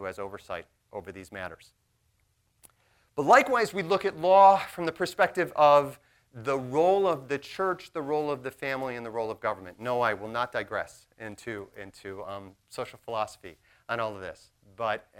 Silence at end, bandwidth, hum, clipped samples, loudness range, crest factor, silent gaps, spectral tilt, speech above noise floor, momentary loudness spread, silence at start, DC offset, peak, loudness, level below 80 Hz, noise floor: 0.2 s; 16.5 kHz; none; under 0.1%; 14 LU; 22 dB; none; -5 dB/octave; 44 dB; 21 LU; 0 s; under 0.1%; -6 dBFS; -26 LUFS; -66 dBFS; -71 dBFS